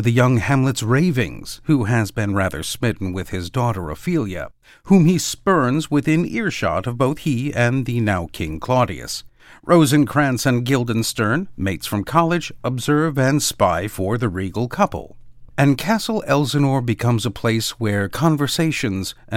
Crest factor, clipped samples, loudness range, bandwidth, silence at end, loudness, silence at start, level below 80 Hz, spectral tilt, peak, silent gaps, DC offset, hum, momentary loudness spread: 18 dB; under 0.1%; 2 LU; 17 kHz; 0 s; -19 LUFS; 0 s; -44 dBFS; -5.5 dB/octave; -2 dBFS; none; under 0.1%; none; 9 LU